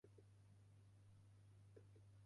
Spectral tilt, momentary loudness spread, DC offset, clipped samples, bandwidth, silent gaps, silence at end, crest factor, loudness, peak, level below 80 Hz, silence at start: -7 dB/octave; 2 LU; under 0.1%; under 0.1%; 11 kHz; none; 0 s; 14 dB; -69 LUFS; -52 dBFS; -82 dBFS; 0.05 s